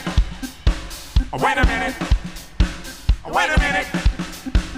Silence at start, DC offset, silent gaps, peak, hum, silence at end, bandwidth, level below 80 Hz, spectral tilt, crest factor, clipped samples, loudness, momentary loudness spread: 0 s; under 0.1%; none; -4 dBFS; none; 0 s; 16 kHz; -22 dBFS; -5 dB/octave; 16 dB; under 0.1%; -22 LUFS; 9 LU